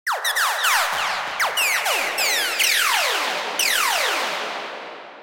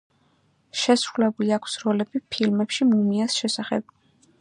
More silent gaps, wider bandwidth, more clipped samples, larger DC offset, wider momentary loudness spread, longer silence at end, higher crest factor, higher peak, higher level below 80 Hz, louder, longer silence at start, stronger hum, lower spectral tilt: neither; first, 17 kHz vs 11 kHz; neither; neither; about the same, 10 LU vs 8 LU; second, 0 s vs 0.6 s; about the same, 16 dB vs 18 dB; about the same, -6 dBFS vs -6 dBFS; about the same, -68 dBFS vs -70 dBFS; first, -19 LUFS vs -23 LUFS; second, 0.05 s vs 0.75 s; neither; second, 2 dB/octave vs -4.5 dB/octave